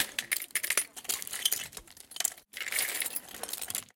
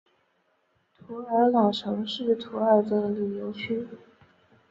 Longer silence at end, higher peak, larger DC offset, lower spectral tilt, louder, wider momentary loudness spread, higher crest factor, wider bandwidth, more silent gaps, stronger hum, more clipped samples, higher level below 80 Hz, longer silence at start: second, 0.1 s vs 0.75 s; about the same, -8 dBFS vs -8 dBFS; neither; second, 2 dB/octave vs -7 dB/octave; second, -32 LUFS vs -26 LUFS; second, 9 LU vs 12 LU; first, 28 dB vs 20 dB; first, 17 kHz vs 7.8 kHz; neither; neither; neither; about the same, -70 dBFS vs -68 dBFS; second, 0 s vs 1.1 s